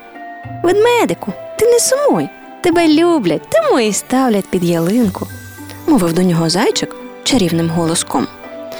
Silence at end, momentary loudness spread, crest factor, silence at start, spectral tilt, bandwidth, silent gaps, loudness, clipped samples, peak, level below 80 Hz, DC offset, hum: 0 s; 14 LU; 12 dB; 0 s; -4.5 dB/octave; over 20 kHz; none; -14 LUFS; under 0.1%; -2 dBFS; -46 dBFS; under 0.1%; none